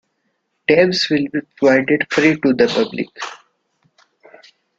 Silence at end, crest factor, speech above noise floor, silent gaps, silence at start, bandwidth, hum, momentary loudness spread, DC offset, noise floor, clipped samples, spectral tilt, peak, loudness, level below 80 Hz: 1.45 s; 18 dB; 53 dB; none; 0.7 s; 7.8 kHz; none; 12 LU; under 0.1%; -69 dBFS; under 0.1%; -5 dB/octave; 0 dBFS; -16 LUFS; -60 dBFS